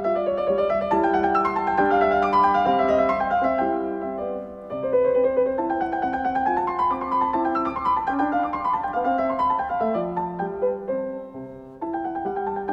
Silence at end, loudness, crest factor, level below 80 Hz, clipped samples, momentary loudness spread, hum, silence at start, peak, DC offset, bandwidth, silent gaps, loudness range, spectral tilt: 0 s; -23 LUFS; 14 dB; -50 dBFS; under 0.1%; 10 LU; none; 0 s; -8 dBFS; under 0.1%; 7.6 kHz; none; 5 LU; -7.5 dB/octave